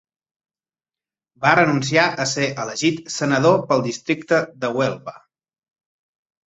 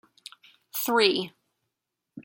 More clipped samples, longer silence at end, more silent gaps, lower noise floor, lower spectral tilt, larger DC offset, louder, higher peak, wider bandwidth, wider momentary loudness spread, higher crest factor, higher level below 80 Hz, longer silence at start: neither; first, 1.3 s vs 0.05 s; neither; first, under -90 dBFS vs -84 dBFS; first, -4.5 dB/octave vs -2.5 dB/octave; neither; first, -19 LUFS vs -25 LUFS; first, -2 dBFS vs -6 dBFS; second, 8.2 kHz vs 17 kHz; second, 8 LU vs 25 LU; about the same, 20 dB vs 24 dB; first, -62 dBFS vs -76 dBFS; first, 1.4 s vs 0.75 s